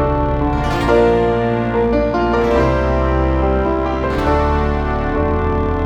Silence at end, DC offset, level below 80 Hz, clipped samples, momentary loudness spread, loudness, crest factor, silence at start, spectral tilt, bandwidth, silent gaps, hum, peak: 0 s; under 0.1%; -22 dBFS; under 0.1%; 4 LU; -16 LUFS; 14 dB; 0 s; -8 dB/octave; 9.4 kHz; none; none; -2 dBFS